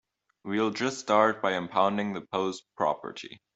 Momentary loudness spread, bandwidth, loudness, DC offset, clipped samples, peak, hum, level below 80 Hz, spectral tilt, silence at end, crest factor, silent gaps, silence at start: 12 LU; 8.2 kHz; -28 LUFS; under 0.1%; under 0.1%; -8 dBFS; none; -74 dBFS; -4.5 dB/octave; 0.2 s; 22 dB; none; 0.45 s